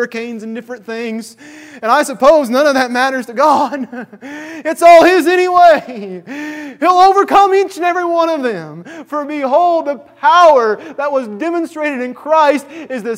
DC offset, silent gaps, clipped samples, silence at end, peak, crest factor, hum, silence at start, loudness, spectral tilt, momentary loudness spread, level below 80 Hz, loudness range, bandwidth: under 0.1%; none; 0.4%; 0 s; 0 dBFS; 12 dB; none; 0 s; -12 LUFS; -4 dB/octave; 18 LU; -54 dBFS; 4 LU; 16 kHz